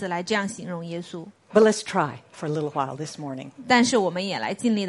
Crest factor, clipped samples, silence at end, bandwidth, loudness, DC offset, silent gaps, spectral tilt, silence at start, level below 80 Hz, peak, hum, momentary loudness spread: 20 dB; under 0.1%; 0 s; 11.5 kHz; -24 LUFS; under 0.1%; none; -4.5 dB/octave; 0 s; -68 dBFS; -4 dBFS; none; 16 LU